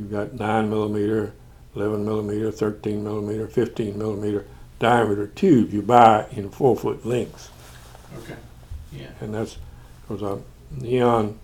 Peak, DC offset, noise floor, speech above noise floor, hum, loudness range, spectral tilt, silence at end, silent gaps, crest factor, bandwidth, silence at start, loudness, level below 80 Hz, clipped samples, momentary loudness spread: 0 dBFS; under 0.1%; -43 dBFS; 22 dB; none; 14 LU; -7 dB/octave; 0 s; none; 22 dB; 17.5 kHz; 0 s; -22 LUFS; -46 dBFS; under 0.1%; 21 LU